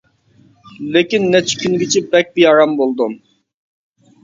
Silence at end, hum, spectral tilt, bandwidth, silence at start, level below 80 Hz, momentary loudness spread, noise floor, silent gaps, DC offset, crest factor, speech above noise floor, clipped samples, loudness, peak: 1.05 s; none; -4 dB/octave; 7.6 kHz; 0.8 s; -60 dBFS; 10 LU; -51 dBFS; none; under 0.1%; 16 dB; 38 dB; under 0.1%; -14 LUFS; 0 dBFS